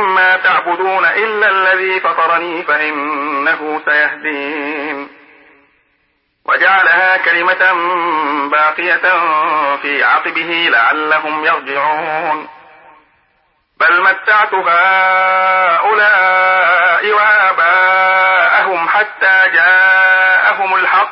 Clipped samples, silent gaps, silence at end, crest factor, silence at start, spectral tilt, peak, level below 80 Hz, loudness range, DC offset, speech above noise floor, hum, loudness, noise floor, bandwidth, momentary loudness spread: under 0.1%; none; 0 s; 12 dB; 0 s; -7.5 dB/octave; 0 dBFS; -70 dBFS; 6 LU; under 0.1%; 49 dB; none; -11 LUFS; -61 dBFS; 5.8 kHz; 8 LU